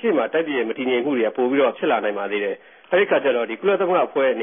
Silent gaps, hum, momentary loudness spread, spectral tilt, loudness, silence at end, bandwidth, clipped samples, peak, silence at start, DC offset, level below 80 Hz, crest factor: none; none; 5 LU; -9.5 dB/octave; -21 LUFS; 0 s; 3.7 kHz; under 0.1%; -6 dBFS; 0 s; under 0.1%; -74 dBFS; 14 dB